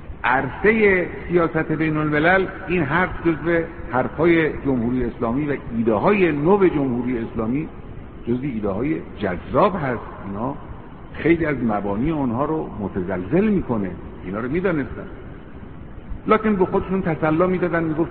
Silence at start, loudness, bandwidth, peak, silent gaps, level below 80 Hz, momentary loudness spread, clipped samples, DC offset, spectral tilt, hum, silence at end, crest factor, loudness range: 0 s; -21 LUFS; 4.5 kHz; -2 dBFS; none; -40 dBFS; 16 LU; under 0.1%; 0.7%; -6.5 dB/octave; none; 0 s; 18 dB; 5 LU